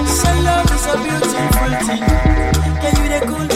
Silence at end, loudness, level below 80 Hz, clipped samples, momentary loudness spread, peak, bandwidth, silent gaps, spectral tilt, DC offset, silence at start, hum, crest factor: 0 s; -15 LUFS; -18 dBFS; under 0.1%; 3 LU; 0 dBFS; 16.5 kHz; none; -5 dB/octave; under 0.1%; 0 s; none; 14 dB